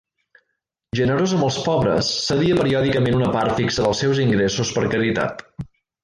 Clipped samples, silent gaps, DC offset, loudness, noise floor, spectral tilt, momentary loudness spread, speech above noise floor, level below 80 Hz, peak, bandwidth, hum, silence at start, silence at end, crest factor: under 0.1%; none; under 0.1%; -19 LUFS; -76 dBFS; -5.5 dB/octave; 9 LU; 57 dB; -44 dBFS; -8 dBFS; 11 kHz; none; 0.95 s; 0.4 s; 14 dB